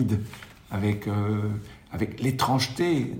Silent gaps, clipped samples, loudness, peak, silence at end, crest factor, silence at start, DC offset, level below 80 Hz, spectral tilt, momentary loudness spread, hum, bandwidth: none; under 0.1%; -27 LUFS; -10 dBFS; 0 s; 18 dB; 0 s; under 0.1%; -54 dBFS; -6 dB/octave; 13 LU; none; 16.5 kHz